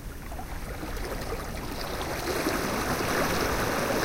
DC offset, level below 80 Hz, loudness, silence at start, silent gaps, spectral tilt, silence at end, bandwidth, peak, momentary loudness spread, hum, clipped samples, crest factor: under 0.1%; -38 dBFS; -30 LUFS; 0 s; none; -4 dB/octave; 0 s; 17 kHz; -14 dBFS; 11 LU; none; under 0.1%; 16 dB